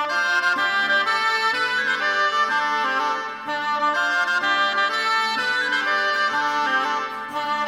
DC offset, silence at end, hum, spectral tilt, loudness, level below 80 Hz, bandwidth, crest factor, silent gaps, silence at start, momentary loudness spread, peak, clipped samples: under 0.1%; 0 s; none; -1 dB/octave; -20 LUFS; -74 dBFS; 16.5 kHz; 14 dB; none; 0 s; 6 LU; -8 dBFS; under 0.1%